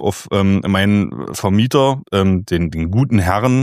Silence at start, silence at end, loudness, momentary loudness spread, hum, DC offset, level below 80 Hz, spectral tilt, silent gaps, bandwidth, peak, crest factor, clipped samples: 0 s; 0 s; -16 LUFS; 5 LU; none; under 0.1%; -38 dBFS; -6.5 dB/octave; none; 15 kHz; 0 dBFS; 14 dB; under 0.1%